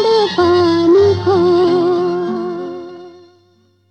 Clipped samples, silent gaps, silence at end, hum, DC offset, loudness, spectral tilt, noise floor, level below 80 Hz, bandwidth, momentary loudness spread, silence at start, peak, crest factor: under 0.1%; none; 0.8 s; none; under 0.1%; -13 LUFS; -7 dB/octave; -54 dBFS; -52 dBFS; 8.4 kHz; 15 LU; 0 s; -2 dBFS; 12 dB